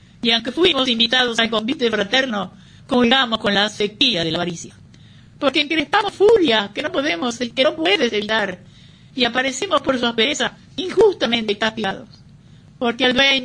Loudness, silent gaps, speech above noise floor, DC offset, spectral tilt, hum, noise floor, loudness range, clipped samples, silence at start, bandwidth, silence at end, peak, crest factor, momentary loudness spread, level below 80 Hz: -18 LUFS; none; 27 dB; under 0.1%; -3.5 dB/octave; none; -45 dBFS; 2 LU; under 0.1%; 0.25 s; 10.5 kHz; 0 s; -2 dBFS; 16 dB; 10 LU; -52 dBFS